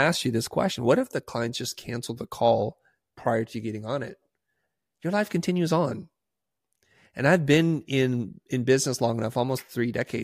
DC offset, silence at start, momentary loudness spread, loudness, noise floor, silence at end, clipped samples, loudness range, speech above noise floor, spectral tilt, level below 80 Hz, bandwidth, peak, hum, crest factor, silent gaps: under 0.1%; 0 s; 11 LU; -26 LUFS; -87 dBFS; 0 s; under 0.1%; 5 LU; 61 dB; -5.5 dB/octave; -62 dBFS; 15.5 kHz; -6 dBFS; none; 20 dB; none